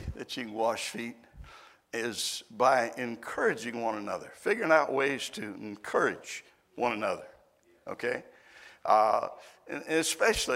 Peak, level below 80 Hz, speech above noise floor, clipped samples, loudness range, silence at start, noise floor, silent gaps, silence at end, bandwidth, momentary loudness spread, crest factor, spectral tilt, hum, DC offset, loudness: -8 dBFS; -56 dBFS; 34 dB; under 0.1%; 5 LU; 0 s; -64 dBFS; none; 0 s; 16 kHz; 16 LU; 24 dB; -3 dB/octave; none; under 0.1%; -30 LUFS